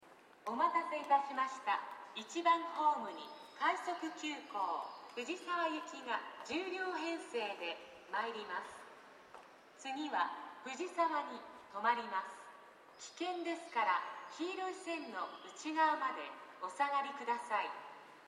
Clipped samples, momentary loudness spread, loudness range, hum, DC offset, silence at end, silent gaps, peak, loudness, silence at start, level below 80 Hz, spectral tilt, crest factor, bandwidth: under 0.1%; 16 LU; 6 LU; none; under 0.1%; 0 s; none; -20 dBFS; -39 LUFS; 0 s; under -90 dBFS; -2 dB/octave; 20 dB; 13 kHz